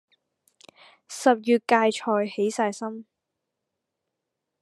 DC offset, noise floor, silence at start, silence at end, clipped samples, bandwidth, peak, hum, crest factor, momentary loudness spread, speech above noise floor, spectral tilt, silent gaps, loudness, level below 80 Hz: under 0.1%; -83 dBFS; 1.1 s; 1.6 s; under 0.1%; 12.5 kHz; -4 dBFS; none; 22 dB; 15 LU; 60 dB; -4 dB/octave; none; -24 LUFS; -88 dBFS